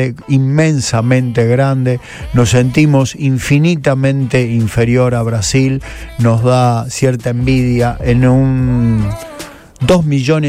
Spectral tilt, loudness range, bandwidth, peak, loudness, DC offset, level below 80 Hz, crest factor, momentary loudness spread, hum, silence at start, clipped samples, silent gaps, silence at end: -6.5 dB/octave; 1 LU; 14 kHz; 0 dBFS; -12 LUFS; under 0.1%; -30 dBFS; 12 dB; 7 LU; none; 0 s; under 0.1%; none; 0 s